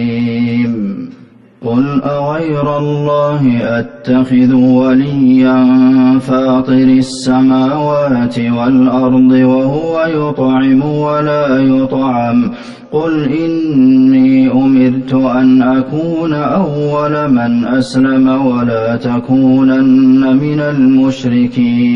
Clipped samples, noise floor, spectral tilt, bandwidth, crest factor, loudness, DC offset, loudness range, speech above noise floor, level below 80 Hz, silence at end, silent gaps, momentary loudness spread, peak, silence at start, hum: under 0.1%; -38 dBFS; -8 dB/octave; 9 kHz; 10 dB; -11 LUFS; under 0.1%; 3 LU; 28 dB; -46 dBFS; 0 s; none; 7 LU; 0 dBFS; 0 s; none